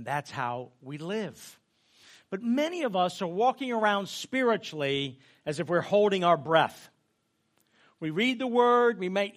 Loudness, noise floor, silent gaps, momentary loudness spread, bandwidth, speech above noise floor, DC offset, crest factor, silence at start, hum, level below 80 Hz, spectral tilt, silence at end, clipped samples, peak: -28 LUFS; -75 dBFS; none; 14 LU; 15 kHz; 47 dB; under 0.1%; 20 dB; 0 s; none; -76 dBFS; -5 dB/octave; 0.05 s; under 0.1%; -8 dBFS